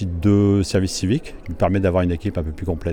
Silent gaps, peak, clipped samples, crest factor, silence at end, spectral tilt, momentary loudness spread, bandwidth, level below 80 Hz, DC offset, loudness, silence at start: none; -6 dBFS; under 0.1%; 14 dB; 0 s; -6.5 dB/octave; 9 LU; 13 kHz; -34 dBFS; under 0.1%; -20 LUFS; 0 s